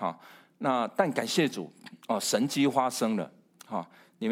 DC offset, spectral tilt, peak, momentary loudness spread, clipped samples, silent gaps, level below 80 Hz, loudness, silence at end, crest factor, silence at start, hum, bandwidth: under 0.1%; -4 dB/octave; -10 dBFS; 17 LU; under 0.1%; none; -82 dBFS; -29 LUFS; 0 s; 20 dB; 0 s; none; 16.5 kHz